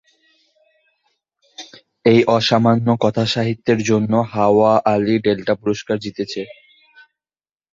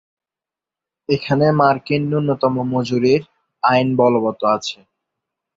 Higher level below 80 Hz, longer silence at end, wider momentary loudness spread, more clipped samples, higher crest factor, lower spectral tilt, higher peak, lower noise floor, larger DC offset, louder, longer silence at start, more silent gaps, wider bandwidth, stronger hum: about the same, -54 dBFS vs -56 dBFS; first, 1.2 s vs 0.8 s; first, 12 LU vs 7 LU; neither; about the same, 16 dB vs 18 dB; about the same, -6 dB/octave vs -7 dB/octave; about the same, -2 dBFS vs -2 dBFS; about the same, under -90 dBFS vs -88 dBFS; neither; about the same, -17 LUFS vs -17 LUFS; first, 1.6 s vs 1.1 s; neither; about the same, 7.6 kHz vs 7.8 kHz; neither